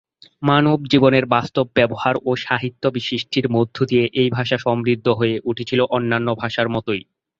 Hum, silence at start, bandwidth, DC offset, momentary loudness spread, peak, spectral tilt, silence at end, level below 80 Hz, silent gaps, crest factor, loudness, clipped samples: none; 0.4 s; 7.6 kHz; under 0.1%; 7 LU; 0 dBFS; -7 dB/octave; 0.4 s; -54 dBFS; none; 18 dB; -19 LUFS; under 0.1%